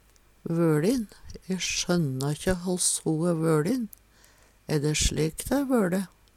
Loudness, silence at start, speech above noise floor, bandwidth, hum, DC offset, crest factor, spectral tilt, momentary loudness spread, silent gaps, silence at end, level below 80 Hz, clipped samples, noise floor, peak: -26 LUFS; 0.45 s; 32 dB; 16 kHz; none; under 0.1%; 16 dB; -4.5 dB/octave; 8 LU; none; 0.3 s; -42 dBFS; under 0.1%; -58 dBFS; -10 dBFS